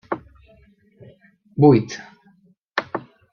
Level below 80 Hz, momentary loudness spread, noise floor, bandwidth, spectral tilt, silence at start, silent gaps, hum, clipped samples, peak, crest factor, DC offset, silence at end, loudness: -58 dBFS; 19 LU; -57 dBFS; 7 kHz; -7.5 dB/octave; 0.1 s; 2.64-2.68 s; none; under 0.1%; -2 dBFS; 20 dB; under 0.1%; 0.35 s; -20 LUFS